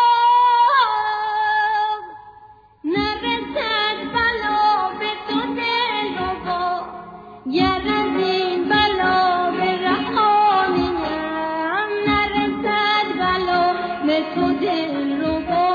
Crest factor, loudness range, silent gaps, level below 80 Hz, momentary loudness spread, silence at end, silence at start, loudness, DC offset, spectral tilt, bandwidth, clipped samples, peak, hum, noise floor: 14 dB; 4 LU; none; -46 dBFS; 8 LU; 0 s; 0 s; -19 LUFS; under 0.1%; -6 dB/octave; 5 kHz; under 0.1%; -4 dBFS; none; -46 dBFS